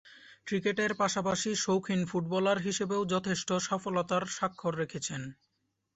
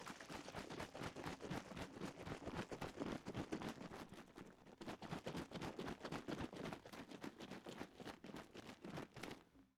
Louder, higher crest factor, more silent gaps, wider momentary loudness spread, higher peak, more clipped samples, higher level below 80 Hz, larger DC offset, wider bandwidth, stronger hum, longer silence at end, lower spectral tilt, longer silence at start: first, -31 LUFS vs -52 LUFS; about the same, 16 dB vs 20 dB; neither; about the same, 6 LU vs 7 LU; first, -16 dBFS vs -32 dBFS; neither; about the same, -68 dBFS vs -70 dBFS; neither; second, 8.2 kHz vs 18 kHz; neither; first, 0.65 s vs 0.1 s; about the same, -4 dB/octave vs -5 dB/octave; about the same, 0.05 s vs 0 s